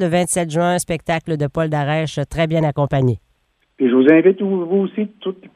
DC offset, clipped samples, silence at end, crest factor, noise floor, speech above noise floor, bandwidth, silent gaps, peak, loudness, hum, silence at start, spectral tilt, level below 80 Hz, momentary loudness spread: under 0.1%; under 0.1%; 0.1 s; 16 dB; -63 dBFS; 46 dB; 15 kHz; none; 0 dBFS; -17 LUFS; none; 0 s; -6 dB/octave; -46 dBFS; 11 LU